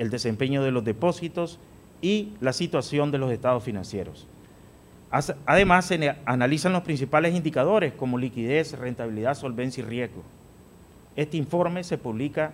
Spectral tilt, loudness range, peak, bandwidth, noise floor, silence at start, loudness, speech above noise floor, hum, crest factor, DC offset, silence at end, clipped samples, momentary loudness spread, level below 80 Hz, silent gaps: -6 dB/octave; 7 LU; -4 dBFS; 16 kHz; -51 dBFS; 0 s; -25 LUFS; 26 dB; none; 22 dB; under 0.1%; 0 s; under 0.1%; 10 LU; -52 dBFS; none